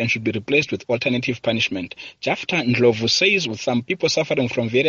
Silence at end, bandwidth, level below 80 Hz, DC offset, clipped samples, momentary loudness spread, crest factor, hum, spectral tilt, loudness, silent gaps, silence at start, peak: 0 s; 7.6 kHz; -58 dBFS; under 0.1%; under 0.1%; 7 LU; 16 dB; none; -3 dB/octave; -20 LUFS; none; 0 s; -4 dBFS